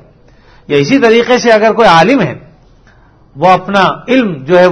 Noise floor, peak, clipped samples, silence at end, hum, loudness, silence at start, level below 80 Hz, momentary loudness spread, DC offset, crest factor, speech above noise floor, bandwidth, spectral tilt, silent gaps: -43 dBFS; 0 dBFS; 1%; 0 s; none; -9 LUFS; 0.7 s; -42 dBFS; 7 LU; under 0.1%; 10 dB; 35 dB; 11 kHz; -5.5 dB/octave; none